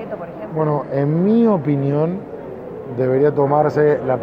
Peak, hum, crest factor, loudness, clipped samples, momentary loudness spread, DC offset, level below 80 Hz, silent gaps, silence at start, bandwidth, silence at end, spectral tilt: -2 dBFS; none; 14 dB; -17 LUFS; under 0.1%; 15 LU; under 0.1%; -54 dBFS; none; 0 s; 6.4 kHz; 0 s; -10.5 dB/octave